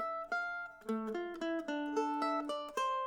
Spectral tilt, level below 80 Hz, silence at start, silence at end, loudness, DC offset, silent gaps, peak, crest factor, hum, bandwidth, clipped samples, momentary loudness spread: -4 dB/octave; -72 dBFS; 0 s; 0 s; -38 LUFS; under 0.1%; none; -22 dBFS; 14 dB; none; 18.5 kHz; under 0.1%; 5 LU